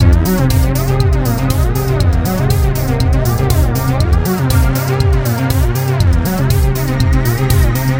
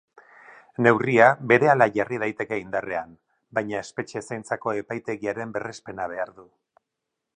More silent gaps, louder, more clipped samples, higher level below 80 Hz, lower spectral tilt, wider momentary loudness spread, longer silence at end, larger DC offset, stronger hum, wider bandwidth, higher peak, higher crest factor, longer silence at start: neither; first, -14 LUFS vs -24 LUFS; neither; first, -16 dBFS vs -64 dBFS; about the same, -6.5 dB/octave vs -6.5 dB/octave; second, 2 LU vs 16 LU; second, 0 s vs 0.95 s; neither; neither; first, 17.5 kHz vs 10 kHz; about the same, 0 dBFS vs 0 dBFS; second, 12 dB vs 24 dB; second, 0 s vs 0.5 s